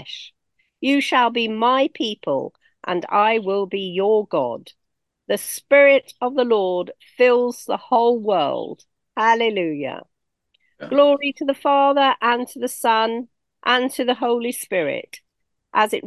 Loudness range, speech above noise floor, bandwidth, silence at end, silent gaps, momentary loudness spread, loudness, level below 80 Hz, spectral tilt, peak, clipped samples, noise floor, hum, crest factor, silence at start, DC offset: 4 LU; 50 dB; 12.5 kHz; 0 s; none; 14 LU; -19 LUFS; -74 dBFS; -3.5 dB/octave; -2 dBFS; under 0.1%; -69 dBFS; none; 18 dB; 0 s; under 0.1%